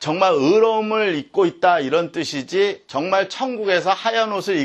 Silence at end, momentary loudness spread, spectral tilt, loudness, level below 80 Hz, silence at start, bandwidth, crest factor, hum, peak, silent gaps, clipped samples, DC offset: 0 s; 8 LU; -4.5 dB/octave; -19 LUFS; -68 dBFS; 0 s; 12.5 kHz; 16 dB; none; -2 dBFS; none; under 0.1%; under 0.1%